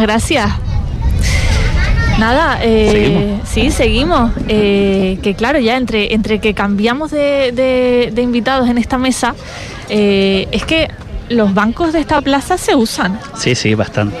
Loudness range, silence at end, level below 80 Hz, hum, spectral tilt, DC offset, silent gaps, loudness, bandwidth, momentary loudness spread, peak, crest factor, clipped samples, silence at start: 2 LU; 0 s; -22 dBFS; none; -5.5 dB/octave; under 0.1%; none; -13 LUFS; 14 kHz; 6 LU; -2 dBFS; 12 dB; under 0.1%; 0 s